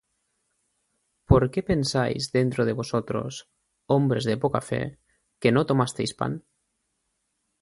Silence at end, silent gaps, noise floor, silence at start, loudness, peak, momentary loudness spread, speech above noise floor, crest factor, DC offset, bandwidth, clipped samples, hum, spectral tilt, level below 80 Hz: 1.2 s; none; -76 dBFS; 1.3 s; -25 LUFS; -2 dBFS; 10 LU; 52 dB; 24 dB; under 0.1%; 11.5 kHz; under 0.1%; none; -6 dB/octave; -44 dBFS